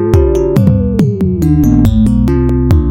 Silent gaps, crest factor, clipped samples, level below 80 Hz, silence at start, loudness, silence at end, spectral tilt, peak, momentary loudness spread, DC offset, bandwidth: none; 10 dB; 0.4%; -16 dBFS; 0 s; -10 LUFS; 0 s; -9 dB/octave; 0 dBFS; 3 LU; under 0.1%; 16.5 kHz